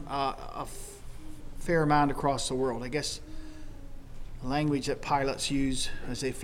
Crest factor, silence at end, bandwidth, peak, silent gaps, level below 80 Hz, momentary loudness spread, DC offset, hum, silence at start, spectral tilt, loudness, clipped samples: 18 dB; 0 s; 15.5 kHz; -12 dBFS; none; -40 dBFS; 23 LU; under 0.1%; none; 0 s; -4.5 dB/octave; -30 LUFS; under 0.1%